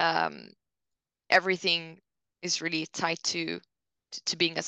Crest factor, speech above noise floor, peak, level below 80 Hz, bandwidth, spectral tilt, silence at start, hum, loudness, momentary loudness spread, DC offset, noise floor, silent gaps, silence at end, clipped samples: 24 dB; 58 dB; -6 dBFS; -80 dBFS; 9.6 kHz; -2 dB/octave; 0 s; none; -28 LUFS; 16 LU; under 0.1%; -87 dBFS; none; 0 s; under 0.1%